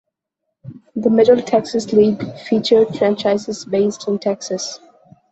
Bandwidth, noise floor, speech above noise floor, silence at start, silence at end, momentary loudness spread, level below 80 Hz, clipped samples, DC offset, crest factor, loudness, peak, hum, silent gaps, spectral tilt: 8.2 kHz; -77 dBFS; 61 dB; 0.65 s; 0.55 s; 12 LU; -58 dBFS; under 0.1%; under 0.1%; 16 dB; -17 LUFS; -2 dBFS; none; none; -5.5 dB/octave